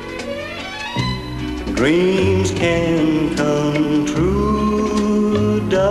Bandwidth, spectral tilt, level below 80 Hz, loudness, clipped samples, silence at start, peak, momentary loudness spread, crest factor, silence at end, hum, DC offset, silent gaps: 13 kHz; -6 dB/octave; -34 dBFS; -18 LUFS; under 0.1%; 0 s; -4 dBFS; 10 LU; 14 dB; 0 s; none; under 0.1%; none